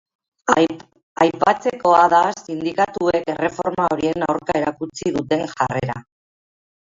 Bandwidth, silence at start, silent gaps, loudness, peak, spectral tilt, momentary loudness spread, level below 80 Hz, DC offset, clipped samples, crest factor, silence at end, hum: 7.8 kHz; 0.45 s; 1.03-1.16 s; -19 LUFS; 0 dBFS; -5.5 dB/octave; 11 LU; -54 dBFS; under 0.1%; under 0.1%; 20 dB; 0.8 s; none